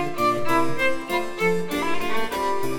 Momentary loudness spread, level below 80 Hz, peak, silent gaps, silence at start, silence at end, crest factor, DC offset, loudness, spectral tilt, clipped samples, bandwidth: 5 LU; -48 dBFS; -8 dBFS; none; 0 s; 0 s; 14 dB; under 0.1%; -24 LUFS; -4.5 dB/octave; under 0.1%; over 20 kHz